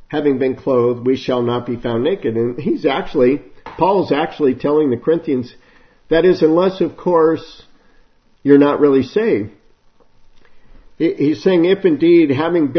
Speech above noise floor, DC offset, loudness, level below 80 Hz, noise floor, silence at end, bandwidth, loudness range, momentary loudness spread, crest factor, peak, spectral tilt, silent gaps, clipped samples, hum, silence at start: 36 dB; under 0.1%; -16 LUFS; -46 dBFS; -51 dBFS; 0 s; 6.4 kHz; 2 LU; 9 LU; 16 dB; 0 dBFS; -8 dB/octave; none; under 0.1%; none; 0.1 s